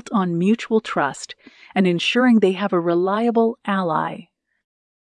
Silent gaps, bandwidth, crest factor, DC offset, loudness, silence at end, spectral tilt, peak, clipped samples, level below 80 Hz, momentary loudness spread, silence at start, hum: none; 10 kHz; 16 dB; under 0.1%; -19 LUFS; 0.95 s; -6 dB/octave; -4 dBFS; under 0.1%; -70 dBFS; 11 LU; 0.05 s; none